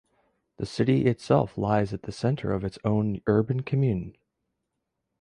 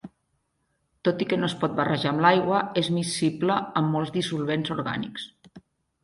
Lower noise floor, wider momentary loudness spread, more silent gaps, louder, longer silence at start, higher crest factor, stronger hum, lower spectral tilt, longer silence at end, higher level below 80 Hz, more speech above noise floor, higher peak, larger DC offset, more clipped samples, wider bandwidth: first, -81 dBFS vs -74 dBFS; about the same, 9 LU vs 9 LU; neither; about the same, -26 LUFS vs -25 LUFS; first, 0.6 s vs 0.05 s; about the same, 18 dB vs 22 dB; neither; first, -8 dB/octave vs -5.5 dB/octave; first, 1.1 s vs 0.45 s; first, -52 dBFS vs -62 dBFS; first, 56 dB vs 49 dB; second, -8 dBFS vs -4 dBFS; neither; neither; about the same, 10.5 kHz vs 11.5 kHz